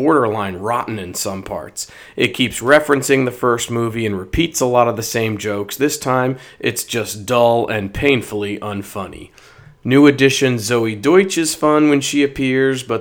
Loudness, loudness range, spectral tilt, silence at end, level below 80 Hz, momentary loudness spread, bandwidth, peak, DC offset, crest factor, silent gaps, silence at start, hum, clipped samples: -16 LUFS; 4 LU; -4.5 dB/octave; 0 s; -42 dBFS; 12 LU; over 20 kHz; 0 dBFS; under 0.1%; 16 dB; none; 0 s; none; under 0.1%